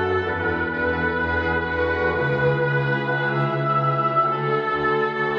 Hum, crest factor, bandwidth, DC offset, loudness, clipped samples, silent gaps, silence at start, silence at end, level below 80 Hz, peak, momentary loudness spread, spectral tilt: none; 12 dB; 5.8 kHz; under 0.1%; -21 LUFS; under 0.1%; none; 0 s; 0 s; -44 dBFS; -10 dBFS; 3 LU; -8.5 dB/octave